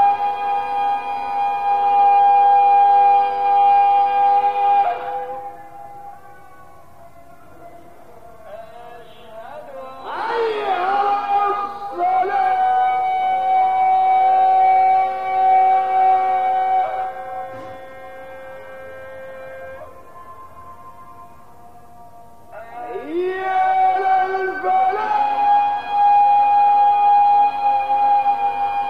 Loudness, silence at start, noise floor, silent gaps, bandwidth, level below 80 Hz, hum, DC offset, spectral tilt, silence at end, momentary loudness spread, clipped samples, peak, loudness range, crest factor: -17 LUFS; 0 s; -45 dBFS; none; 5.2 kHz; -60 dBFS; none; 0.8%; -4.5 dB/octave; 0 s; 22 LU; under 0.1%; -6 dBFS; 21 LU; 12 dB